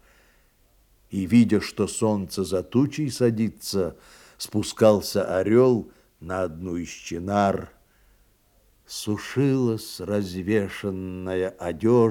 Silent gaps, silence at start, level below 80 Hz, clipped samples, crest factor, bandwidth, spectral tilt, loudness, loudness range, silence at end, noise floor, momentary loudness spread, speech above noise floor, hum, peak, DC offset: none; 1.1 s; -58 dBFS; under 0.1%; 20 dB; 17 kHz; -6 dB/octave; -24 LUFS; 5 LU; 0 s; -61 dBFS; 13 LU; 38 dB; none; -4 dBFS; under 0.1%